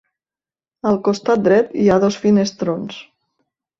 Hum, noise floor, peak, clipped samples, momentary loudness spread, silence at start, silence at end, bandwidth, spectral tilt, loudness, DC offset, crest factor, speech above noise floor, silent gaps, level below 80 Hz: none; under -90 dBFS; -2 dBFS; under 0.1%; 11 LU; 0.85 s; 0.8 s; 7.6 kHz; -6.5 dB/octave; -17 LUFS; under 0.1%; 16 dB; over 74 dB; none; -54 dBFS